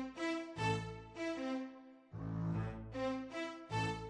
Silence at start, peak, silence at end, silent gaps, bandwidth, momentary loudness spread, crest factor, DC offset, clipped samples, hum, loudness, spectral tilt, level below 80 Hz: 0 s; -24 dBFS; 0 s; none; 11 kHz; 10 LU; 16 dB; under 0.1%; under 0.1%; none; -42 LUFS; -6 dB/octave; -60 dBFS